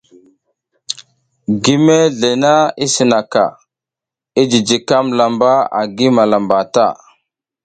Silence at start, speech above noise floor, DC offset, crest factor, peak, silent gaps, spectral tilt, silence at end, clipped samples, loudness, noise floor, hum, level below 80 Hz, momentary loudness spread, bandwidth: 0.9 s; 74 dB; under 0.1%; 14 dB; 0 dBFS; none; -4.5 dB/octave; 0.7 s; under 0.1%; -13 LUFS; -86 dBFS; none; -56 dBFS; 11 LU; 9.4 kHz